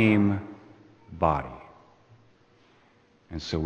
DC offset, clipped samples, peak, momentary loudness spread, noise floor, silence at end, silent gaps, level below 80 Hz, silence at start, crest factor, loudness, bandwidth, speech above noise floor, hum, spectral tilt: under 0.1%; under 0.1%; -8 dBFS; 24 LU; -61 dBFS; 0 s; none; -48 dBFS; 0 s; 22 dB; -27 LUFS; 8.8 kHz; 37 dB; none; -7.5 dB/octave